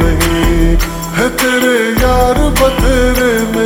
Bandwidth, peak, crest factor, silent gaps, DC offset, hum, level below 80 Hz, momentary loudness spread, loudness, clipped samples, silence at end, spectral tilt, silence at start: over 20 kHz; 0 dBFS; 10 dB; none; under 0.1%; none; -16 dBFS; 4 LU; -12 LUFS; under 0.1%; 0 s; -4.5 dB/octave; 0 s